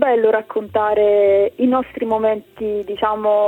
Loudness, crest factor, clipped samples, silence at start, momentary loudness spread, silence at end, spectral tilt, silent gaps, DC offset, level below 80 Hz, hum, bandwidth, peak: -17 LUFS; 14 dB; under 0.1%; 0 s; 9 LU; 0 s; -7 dB/octave; none; under 0.1%; -52 dBFS; none; 4.1 kHz; -2 dBFS